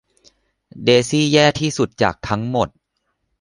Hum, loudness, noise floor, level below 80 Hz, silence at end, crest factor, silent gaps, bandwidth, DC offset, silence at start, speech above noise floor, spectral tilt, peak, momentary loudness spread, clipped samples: none; -17 LUFS; -72 dBFS; -48 dBFS; 0.75 s; 18 dB; none; 11.5 kHz; under 0.1%; 0.75 s; 55 dB; -4.5 dB/octave; 0 dBFS; 8 LU; under 0.1%